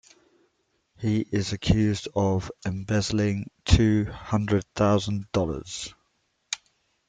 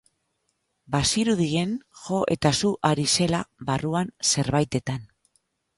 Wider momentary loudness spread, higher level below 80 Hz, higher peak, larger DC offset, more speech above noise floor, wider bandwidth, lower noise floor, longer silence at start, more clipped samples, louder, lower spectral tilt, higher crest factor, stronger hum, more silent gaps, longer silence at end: first, 12 LU vs 8 LU; first, -40 dBFS vs -50 dBFS; about the same, -4 dBFS vs -6 dBFS; neither; about the same, 48 dB vs 51 dB; second, 9.4 kHz vs 11.5 kHz; about the same, -72 dBFS vs -75 dBFS; about the same, 1 s vs 0.9 s; neither; about the same, -26 LUFS vs -24 LUFS; first, -6 dB/octave vs -4 dB/octave; about the same, 22 dB vs 20 dB; neither; neither; second, 0.5 s vs 0.75 s